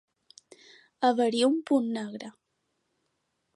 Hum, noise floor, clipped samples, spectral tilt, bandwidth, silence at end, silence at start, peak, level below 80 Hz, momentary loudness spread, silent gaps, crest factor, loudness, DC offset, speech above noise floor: none; -78 dBFS; under 0.1%; -4.5 dB/octave; 11.5 kHz; 1.25 s; 1 s; -10 dBFS; -84 dBFS; 16 LU; none; 20 dB; -26 LUFS; under 0.1%; 52 dB